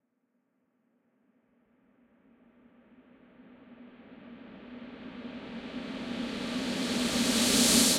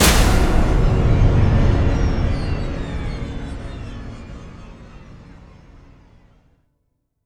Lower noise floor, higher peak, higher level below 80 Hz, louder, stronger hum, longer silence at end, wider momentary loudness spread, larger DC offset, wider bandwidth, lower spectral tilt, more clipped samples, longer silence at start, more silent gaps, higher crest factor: first, -77 dBFS vs -70 dBFS; second, -10 dBFS vs 0 dBFS; second, -60 dBFS vs -22 dBFS; second, -28 LUFS vs -19 LUFS; neither; second, 0 s vs 2.1 s; first, 27 LU vs 22 LU; neither; second, 16 kHz vs 19.5 kHz; second, -2 dB/octave vs -5 dB/octave; neither; first, 3.4 s vs 0 s; neither; first, 24 dB vs 18 dB